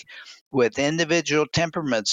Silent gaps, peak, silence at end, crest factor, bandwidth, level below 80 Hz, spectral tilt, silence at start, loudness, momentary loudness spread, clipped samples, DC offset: 0.41-0.51 s; -6 dBFS; 0 s; 16 dB; 9.4 kHz; -56 dBFS; -4 dB/octave; 0.1 s; -22 LUFS; 11 LU; under 0.1%; under 0.1%